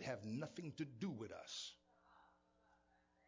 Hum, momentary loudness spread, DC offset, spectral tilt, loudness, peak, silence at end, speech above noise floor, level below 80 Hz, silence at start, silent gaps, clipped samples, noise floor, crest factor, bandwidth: none; 5 LU; under 0.1%; -5 dB/octave; -49 LUFS; -32 dBFS; 1 s; 29 dB; -82 dBFS; 0 s; none; under 0.1%; -78 dBFS; 20 dB; 7.6 kHz